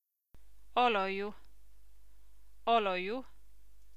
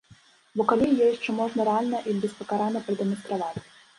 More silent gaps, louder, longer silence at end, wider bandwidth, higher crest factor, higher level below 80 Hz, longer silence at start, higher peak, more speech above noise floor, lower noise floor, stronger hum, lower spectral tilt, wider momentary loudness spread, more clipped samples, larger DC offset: neither; second, -33 LUFS vs -26 LUFS; first, 0.75 s vs 0.4 s; first, 15 kHz vs 11.5 kHz; about the same, 20 dB vs 20 dB; about the same, -64 dBFS vs -64 dBFS; second, 0 s vs 0.55 s; second, -16 dBFS vs -6 dBFS; about the same, 31 dB vs 31 dB; first, -63 dBFS vs -56 dBFS; neither; second, -5 dB/octave vs -6.5 dB/octave; about the same, 11 LU vs 9 LU; neither; first, 0.5% vs under 0.1%